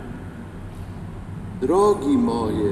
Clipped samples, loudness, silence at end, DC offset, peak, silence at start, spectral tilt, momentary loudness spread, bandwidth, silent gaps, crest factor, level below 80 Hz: under 0.1%; -20 LUFS; 0 s; under 0.1%; -6 dBFS; 0 s; -7.5 dB/octave; 18 LU; 12.5 kHz; none; 16 dB; -42 dBFS